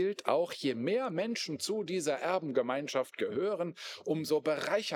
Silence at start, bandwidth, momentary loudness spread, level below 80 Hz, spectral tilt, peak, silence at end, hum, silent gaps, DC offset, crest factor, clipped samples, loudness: 0 s; 19 kHz; 4 LU; under -90 dBFS; -4.5 dB/octave; -12 dBFS; 0 s; none; none; under 0.1%; 22 dB; under 0.1%; -33 LUFS